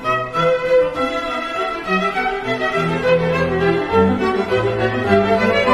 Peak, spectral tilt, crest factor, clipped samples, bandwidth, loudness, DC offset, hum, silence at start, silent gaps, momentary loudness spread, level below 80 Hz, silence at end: -2 dBFS; -6.5 dB/octave; 14 dB; under 0.1%; 12.5 kHz; -17 LUFS; under 0.1%; none; 0 s; none; 6 LU; -42 dBFS; 0 s